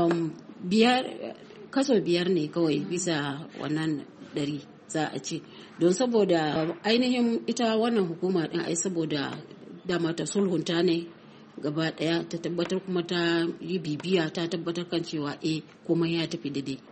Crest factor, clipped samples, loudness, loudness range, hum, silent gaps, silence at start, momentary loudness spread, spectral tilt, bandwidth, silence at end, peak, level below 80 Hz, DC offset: 20 dB; under 0.1%; -28 LUFS; 4 LU; none; none; 0 s; 12 LU; -5 dB/octave; 8.8 kHz; 0 s; -8 dBFS; -70 dBFS; under 0.1%